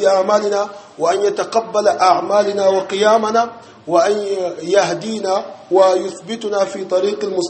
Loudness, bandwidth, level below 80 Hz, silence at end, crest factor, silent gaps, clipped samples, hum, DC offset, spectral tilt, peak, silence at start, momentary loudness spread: -16 LUFS; 8.8 kHz; -66 dBFS; 0 s; 16 dB; none; under 0.1%; none; under 0.1%; -4 dB/octave; 0 dBFS; 0 s; 8 LU